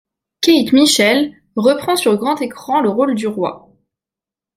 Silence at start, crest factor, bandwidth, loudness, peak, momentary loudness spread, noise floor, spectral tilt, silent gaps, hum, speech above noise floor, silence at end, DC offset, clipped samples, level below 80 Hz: 0.4 s; 14 dB; 16 kHz; -15 LUFS; -2 dBFS; 10 LU; -88 dBFS; -3.5 dB/octave; none; none; 74 dB; 1 s; under 0.1%; under 0.1%; -60 dBFS